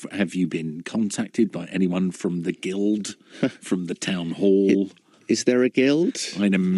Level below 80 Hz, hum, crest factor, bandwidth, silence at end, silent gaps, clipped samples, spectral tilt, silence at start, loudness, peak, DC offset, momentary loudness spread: -74 dBFS; none; 18 dB; 12 kHz; 0 s; none; under 0.1%; -5.5 dB/octave; 0 s; -23 LUFS; -4 dBFS; under 0.1%; 9 LU